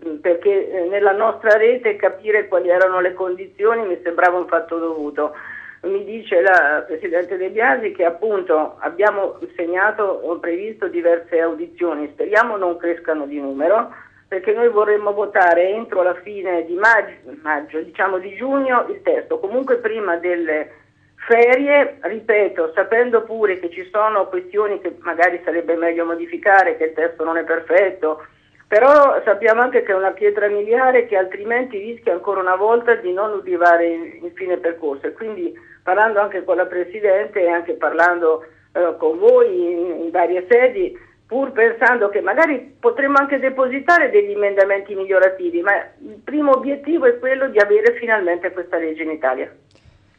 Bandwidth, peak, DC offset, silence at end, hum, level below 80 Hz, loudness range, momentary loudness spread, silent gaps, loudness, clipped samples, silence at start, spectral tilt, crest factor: 7.4 kHz; -2 dBFS; under 0.1%; 0.7 s; none; -64 dBFS; 4 LU; 11 LU; none; -17 LUFS; under 0.1%; 0 s; -5.5 dB/octave; 16 dB